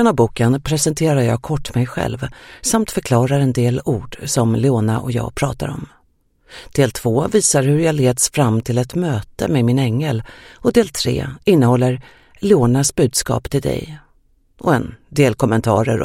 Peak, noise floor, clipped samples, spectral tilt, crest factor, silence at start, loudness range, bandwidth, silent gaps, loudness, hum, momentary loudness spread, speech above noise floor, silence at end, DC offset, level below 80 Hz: 0 dBFS; -58 dBFS; under 0.1%; -5.5 dB/octave; 16 dB; 0 s; 3 LU; 16 kHz; none; -17 LUFS; none; 9 LU; 42 dB; 0 s; under 0.1%; -40 dBFS